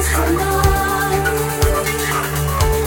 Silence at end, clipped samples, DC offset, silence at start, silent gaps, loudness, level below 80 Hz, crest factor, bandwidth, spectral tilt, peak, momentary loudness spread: 0 s; under 0.1%; under 0.1%; 0 s; none; -17 LUFS; -22 dBFS; 14 dB; 18 kHz; -4.5 dB/octave; -2 dBFS; 3 LU